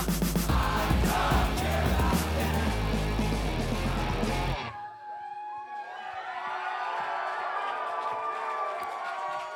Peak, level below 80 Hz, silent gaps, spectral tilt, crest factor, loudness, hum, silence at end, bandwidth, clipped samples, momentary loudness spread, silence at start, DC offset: -12 dBFS; -34 dBFS; none; -5 dB/octave; 16 dB; -30 LUFS; none; 0 s; over 20 kHz; under 0.1%; 12 LU; 0 s; under 0.1%